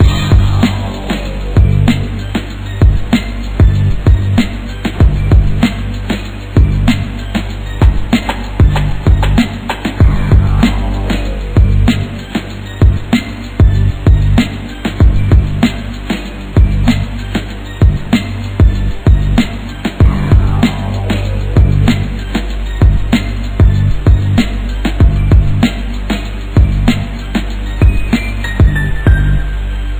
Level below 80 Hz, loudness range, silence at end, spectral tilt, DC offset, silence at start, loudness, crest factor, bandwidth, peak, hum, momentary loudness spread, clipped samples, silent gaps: -14 dBFS; 2 LU; 0 s; -7 dB/octave; under 0.1%; 0 s; -13 LUFS; 10 dB; 15.5 kHz; 0 dBFS; none; 9 LU; 0.6%; none